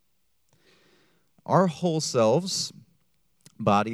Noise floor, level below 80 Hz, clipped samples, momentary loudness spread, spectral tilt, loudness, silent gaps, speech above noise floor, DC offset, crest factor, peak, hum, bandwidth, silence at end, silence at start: -74 dBFS; -70 dBFS; under 0.1%; 8 LU; -5 dB/octave; -25 LUFS; none; 50 dB; under 0.1%; 22 dB; -6 dBFS; none; 14.5 kHz; 0 s; 1.5 s